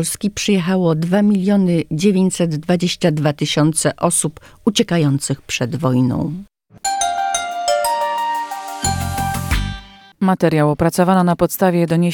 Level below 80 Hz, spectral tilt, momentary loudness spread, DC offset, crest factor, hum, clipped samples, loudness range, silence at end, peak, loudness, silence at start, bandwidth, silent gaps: -36 dBFS; -5 dB/octave; 7 LU; under 0.1%; 16 dB; none; under 0.1%; 4 LU; 0 s; -2 dBFS; -17 LUFS; 0 s; 19 kHz; none